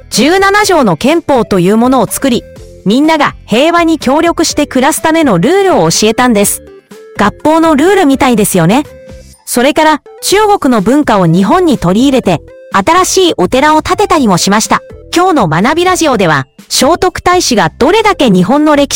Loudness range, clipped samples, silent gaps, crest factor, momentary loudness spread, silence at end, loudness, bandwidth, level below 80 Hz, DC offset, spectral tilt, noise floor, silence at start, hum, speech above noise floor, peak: 1 LU; under 0.1%; none; 8 dB; 6 LU; 0 s; -8 LUFS; 17.5 kHz; -34 dBFS; under 0.1%; -4.5 dB/octave; -32 dBFS; 0.1 s; none; 24 dB; 0 dBFS